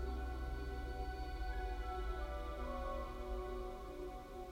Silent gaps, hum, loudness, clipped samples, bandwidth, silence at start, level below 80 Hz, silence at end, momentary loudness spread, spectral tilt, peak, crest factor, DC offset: none; none; -46 LUFS; under 0.1%; 16 kHz; 0 s; -44 dBFS; 0 s; 4 LU; -6.5 dB/octave; -30 dBFS; 12 dB; under 0.1%